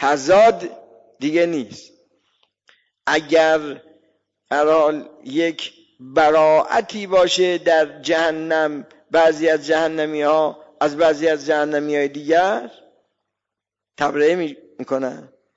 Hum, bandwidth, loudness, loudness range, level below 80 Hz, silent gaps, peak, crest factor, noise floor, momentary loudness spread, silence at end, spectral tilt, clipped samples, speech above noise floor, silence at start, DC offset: none; 8 kHz; -18 LUFS; 4 LU; -60 dBFS; none; -6 dBFS; 14 dB; -85 dBFS; 14 LU; 0.3 s; -4 dB/octave; under 0.1%; 67 dB; 0 s; under 0.1%